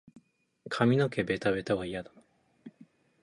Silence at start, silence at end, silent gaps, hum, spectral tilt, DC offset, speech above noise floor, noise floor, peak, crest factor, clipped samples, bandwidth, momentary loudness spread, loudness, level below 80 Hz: 0.65 s; 0.55 s; none; none; -7 dB/octave; under 0.1%; 33 dB; -62 dBFS; -10 dBFS; 22 dB; under 0.1%; 11 kHz; 14 LU; -30 LUFS; -62 dBFS